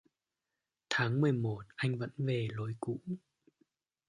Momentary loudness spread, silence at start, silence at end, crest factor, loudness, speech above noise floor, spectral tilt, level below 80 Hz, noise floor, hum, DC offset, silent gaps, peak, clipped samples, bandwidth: 10 LU; 0.9 s; 0.9 s; 20 dB; -35 LUFS; 55 dB; -6.5 dB/octave; -72 dBFS; -89 dBFS; none; under 0.1%; none; -16 dBFS; under 0.1%; 11 kHz